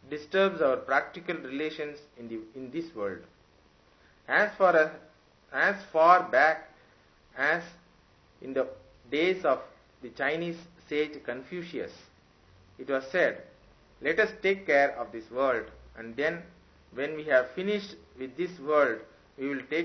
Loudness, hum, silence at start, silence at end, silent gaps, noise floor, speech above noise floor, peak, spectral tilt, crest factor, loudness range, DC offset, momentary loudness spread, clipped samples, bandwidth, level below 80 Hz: -28 LUFS; none; 0.1 s; 0 s; none; -62 dBFS; 33 dB; -6 dBFS; -5.5 dB/octave; 24 dB; 8 LU; under 0.1%; 18 LU; under 0.1%; 6.4 kHz; -66 dBFS